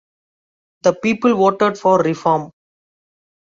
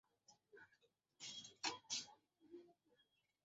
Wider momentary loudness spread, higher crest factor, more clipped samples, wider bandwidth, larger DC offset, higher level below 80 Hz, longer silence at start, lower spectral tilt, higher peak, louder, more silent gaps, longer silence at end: second, 5 LU vs 20 LU; second, 16 dB vs 26 dB; neither; about the same, 7.8 kHz vs 7.6 kHz; neither; first, -62 dBFS vs under -90 dBFS; first, 0.85 s vs 0.3 s; first, -6 dB/octave vs 1 dB/octave; first, -2 dBFS vs -30 dBFS; first, -16 LUFS vs -49 LUFS; neither; first, 1.05 s vs 0.7 s